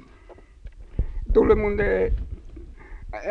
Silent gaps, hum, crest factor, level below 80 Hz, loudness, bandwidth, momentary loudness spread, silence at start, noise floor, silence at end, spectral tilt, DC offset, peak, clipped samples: none; none; 18 dB; -30 dBFS; -23 LUFS; 6.2 kHz; 25 LU; 0.3 s; -48 dBFS; 0 s; -9 dB/octave; under 0.1%; -6 dBFS; under 0.1%